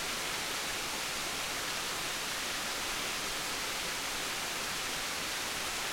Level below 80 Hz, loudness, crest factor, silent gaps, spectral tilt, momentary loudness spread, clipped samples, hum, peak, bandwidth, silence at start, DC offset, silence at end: -56 dBFS; -34 LUFS; 14 dB; none; -0.5 dB/octave; 0 LU; under 0.1%; none; -22 dBFS; 16.5 kHz; 0 s; under 0.1%; 0 s